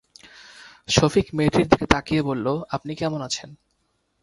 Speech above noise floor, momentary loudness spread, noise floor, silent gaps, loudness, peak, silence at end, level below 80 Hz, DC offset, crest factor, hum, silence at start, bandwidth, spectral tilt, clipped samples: 49 dB; 11 LU; -70 dBFS; none; -22 LUFS; 0 dBFS; 0.7 s; -42 dBFS; under 0.1%; 24 dB; none; 0.6 s; 11.5 kHz; -5 dB/octave; under 0.1%